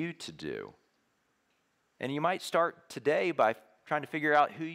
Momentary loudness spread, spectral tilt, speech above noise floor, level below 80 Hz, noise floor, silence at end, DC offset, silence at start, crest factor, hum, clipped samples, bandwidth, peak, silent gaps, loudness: 14 LU; -5 dB/octave; 44 dB; -76 dBFS; -75 dBFS; 0 s; under 0.1%; 0 s; 20 dB; none; under 0.1%; 16 kHz; -14 dBFS; none; -31 LUFS